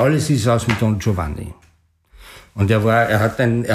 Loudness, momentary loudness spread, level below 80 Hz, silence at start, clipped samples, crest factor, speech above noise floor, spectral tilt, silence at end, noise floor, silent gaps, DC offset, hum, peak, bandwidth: -18 LUFS; 14 LU; -40 dBFS; 0 s; under 0.1%; 14 dB; 39 dB; -6.5 dB/octave; 0 s; -56 dBFS; none; under 0.1%; none; -4 dBFS; 15 kHz